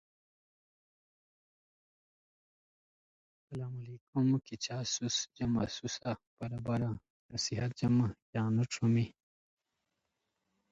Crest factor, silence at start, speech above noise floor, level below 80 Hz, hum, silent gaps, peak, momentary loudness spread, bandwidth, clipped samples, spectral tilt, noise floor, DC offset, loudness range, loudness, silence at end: 16 dB; 3.5 s; 51 dB; -64 dBFS; none; 4.01-4.13 s, 6.27-6.37 s, 7.10-7.29 s, 8.22-8.33 s; -20 dBFS; 12 LU; 8 kHz; under 0.1%; -5 dB/octave; -85 dBFS; under 0.1%; 7 LU; -35 LUFS; 1.6 s